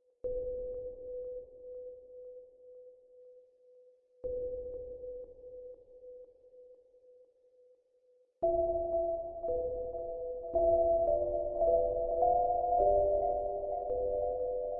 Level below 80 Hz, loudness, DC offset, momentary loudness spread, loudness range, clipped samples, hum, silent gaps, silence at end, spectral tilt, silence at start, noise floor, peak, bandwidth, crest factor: -52 dBFS; -33 LUFS; under 0.1%; 22 LU; 18 LU; under 0.1%; none; none; 0 s; -12 dB/octave; 0.25 s; -69 dBFS; -16 dBFS; 1.3 kHz; 18 dB